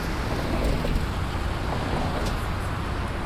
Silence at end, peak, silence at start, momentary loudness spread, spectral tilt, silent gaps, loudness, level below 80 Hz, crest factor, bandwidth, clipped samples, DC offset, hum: 0 s; -12 dBFS; 0 s; 3 LU; -6 dB/octave; none; -28 LUFS; -30 dBFS; 14 dB; 15.5 kHz; under 0.1%; under 0.1%; none